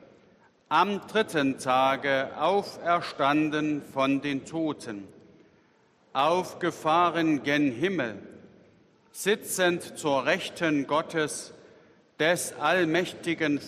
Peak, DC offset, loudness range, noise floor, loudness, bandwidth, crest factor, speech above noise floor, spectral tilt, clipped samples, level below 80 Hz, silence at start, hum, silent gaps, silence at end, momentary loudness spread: -8 dBFS; under 0.1%; 3 LU; -63 dBFS; -27 LUFS; 14 kHz; 20 dB; 36 dB; -4 dB/octave; under 0.1%; -72 dBFS; 0.7 s; none; none; 0 s; 8 LU